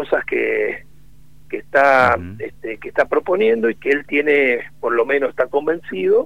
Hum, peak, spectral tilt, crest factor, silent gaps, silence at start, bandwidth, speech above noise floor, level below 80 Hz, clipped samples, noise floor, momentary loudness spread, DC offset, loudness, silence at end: none; 0 dBFS; -6 dB/octave; 18 dB; none; 0 s; 10 kHz; 31 dB; -52 dBFS; under 0.1%; -49 dBFS; 15 LU; 1%; -17 LUFS; 0 s